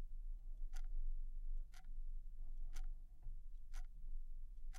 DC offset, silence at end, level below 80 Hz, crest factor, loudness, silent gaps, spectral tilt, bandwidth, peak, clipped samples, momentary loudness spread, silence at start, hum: under 0.1%; 0 s; -44 dBFS; 10 dB; -56 LUFS; none; -4.5 dB/octave; 6.4 kHz; -34 dBFS; under 0.1%; 7 LU; 0 s; none